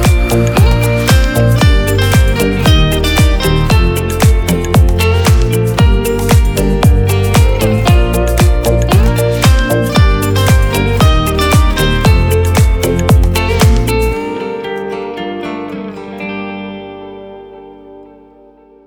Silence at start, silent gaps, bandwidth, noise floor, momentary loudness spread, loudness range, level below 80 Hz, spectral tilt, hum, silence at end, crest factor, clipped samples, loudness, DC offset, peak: 0 s; none; 19.5 kHz; -42 dBFS; 11 LU; 11 LU; -14 dBFS; -5.5 dB/octave; 50 Hz at -25 dBFS; 0.85 s; 10 dB; under 0.1%; -11 LUFS; under 0.1%; 0 dBFS